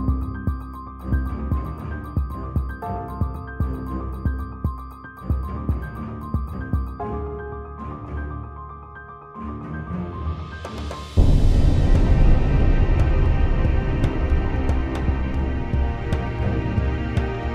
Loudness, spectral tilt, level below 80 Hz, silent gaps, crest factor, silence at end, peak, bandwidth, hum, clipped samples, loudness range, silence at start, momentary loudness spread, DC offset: -25 LUFS; -8.5 dB/octave; -24 dBFS; none; 18 dB; 0 s; -4 dBFS; 7.6 kHz; none; under 0.1%; 11 LU; 0 s; 14 LU; under 0.1%